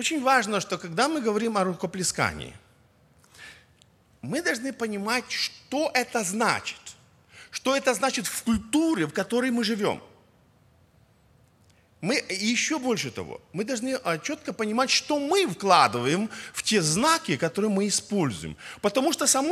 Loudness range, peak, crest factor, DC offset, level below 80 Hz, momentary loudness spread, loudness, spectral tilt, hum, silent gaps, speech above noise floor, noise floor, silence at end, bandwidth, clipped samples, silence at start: 7 LU; -4 dBFS; 24 dB; under 0.1%; -58 dBFS; 11 LU; -25 LUFS; -3 dB/octave; none; none; 34 dB; -60 dBFS; 0 s; 16 kHz; under 0.1%; 0 s